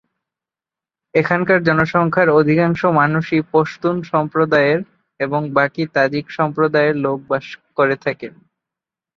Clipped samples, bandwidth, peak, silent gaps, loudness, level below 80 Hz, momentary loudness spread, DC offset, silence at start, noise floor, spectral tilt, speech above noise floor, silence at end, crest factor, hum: under 0.1%; 7 kHz; 0 dBFS; none; -17 LUFS; -56 dBFS; 9 LU; under 0.1%; 1.15 s; -89 dBFS; -8 dB/octave; 73 dB; 0.85 s; 18 dB; none